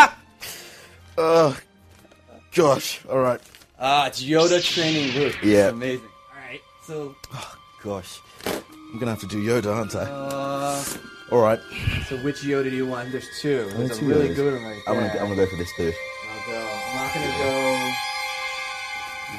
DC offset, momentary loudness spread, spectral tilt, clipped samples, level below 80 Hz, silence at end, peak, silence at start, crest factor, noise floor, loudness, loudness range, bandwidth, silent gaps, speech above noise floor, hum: under 0.1%; 17 LU; -4.5 dB/octave; under 0.1%; -48 dBFS; 0 s; -2 dBFS; 0 s; 22 dB; -51 dBFS; -23 LUFS; 7 LU; 14.5 kHz; none; 29 dB; none